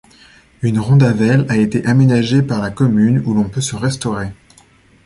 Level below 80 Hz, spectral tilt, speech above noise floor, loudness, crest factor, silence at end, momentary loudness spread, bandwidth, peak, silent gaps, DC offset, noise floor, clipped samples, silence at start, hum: -44 dBFS; -6.5 dB/octave; 35 dB; -15 LUFS; 14 dB; 0.7 s; 9 LU; 11.5 kHz; -2 dBFS; none; under 0.1%; -49 dBFS; under 0.1%; 0.6 s; none